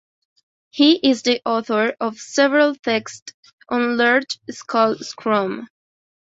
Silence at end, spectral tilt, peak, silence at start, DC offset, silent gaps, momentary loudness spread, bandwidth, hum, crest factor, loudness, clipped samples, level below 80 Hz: 0.55 s; -3.5 dB/octave; -2 dBFS; 0.75 s; under 0.1%; 3.22-3.26 s, 3.34-3.43 s, 3.53-3.58 s; 14 LU; 8 kHz; none; 18 dB; -19 LUFS; under 0.1%; -66 dBFS